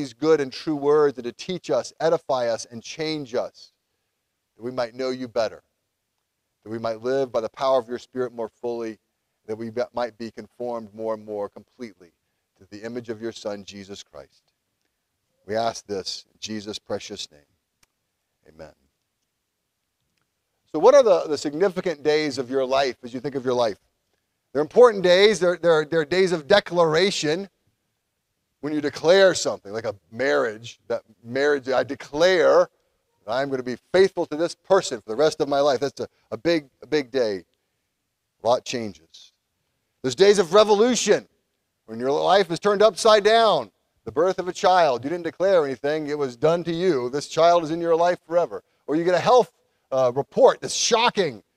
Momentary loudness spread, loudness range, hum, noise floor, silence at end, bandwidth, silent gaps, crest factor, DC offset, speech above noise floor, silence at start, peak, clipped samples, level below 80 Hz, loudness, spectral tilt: 16 LU; 13 LU; none; -77 dBFS; 0.2 s; 13 kHz; none; 20 dB; under 0.1%; 56 dB; 0 s; -2 dBFS; under 0.1%; -64 dBFS; -22 LUFS; -4 dB/octave